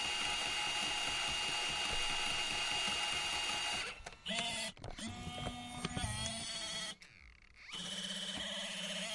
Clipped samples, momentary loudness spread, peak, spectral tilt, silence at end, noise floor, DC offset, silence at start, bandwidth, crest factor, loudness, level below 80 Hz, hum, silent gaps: under 0.1%; 10 LU; -22 dBFS; -1.5 dB/octave; 0 s; -60 dBFS; under 0.1%; 0 s; 11.5 kHz; 18 dB; -37 LUFS; -56 dBFS; none; none